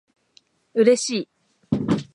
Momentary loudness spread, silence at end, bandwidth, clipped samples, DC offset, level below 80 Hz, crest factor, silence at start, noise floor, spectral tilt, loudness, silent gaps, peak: 11 LU; 0.1 s; 11.5 kHz; under 0.1%; under 0.1%; -56 dBFS; 20 dB; 0.75 s; -60 dBFS; -5 dB/octave; -22 LUFS; none; -4 dBFS